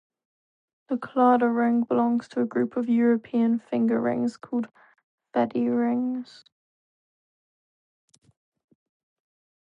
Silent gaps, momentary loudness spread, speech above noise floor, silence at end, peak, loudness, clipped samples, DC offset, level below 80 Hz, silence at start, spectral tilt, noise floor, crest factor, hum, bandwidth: 5.04-5.18 s; 10 LU; over 66 dB; 3.45 s; -10 dBFS; -25 LUFS; under 0.1%; under 0.1%; -76 dBFS; 0.9 s; -8 dB/octave; under -90 dBFS; 16 dB; none; 7.2 kHz